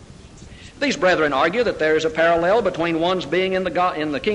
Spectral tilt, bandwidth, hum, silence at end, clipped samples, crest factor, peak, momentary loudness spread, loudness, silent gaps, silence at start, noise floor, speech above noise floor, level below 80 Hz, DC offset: -5 dB/octave; 10.5 kHz; none; 0 s; under 0.1%; 14 dB; -6 dBFS; 4 LU; -19 LUFS; none; 0 s; -41 dBFS; 22 dB; -48 dBFS; under 0.1%